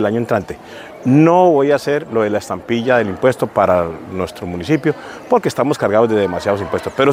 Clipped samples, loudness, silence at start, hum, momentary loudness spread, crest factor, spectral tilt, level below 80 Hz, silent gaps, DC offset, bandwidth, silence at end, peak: under 0.1%; -16 LUFS; 0 s; none; 12 LU; 16 dB; -6.5 dB/octave; -50 dBFS; none; under 0.1%; 16 kHz; 0 s; 0 dBFS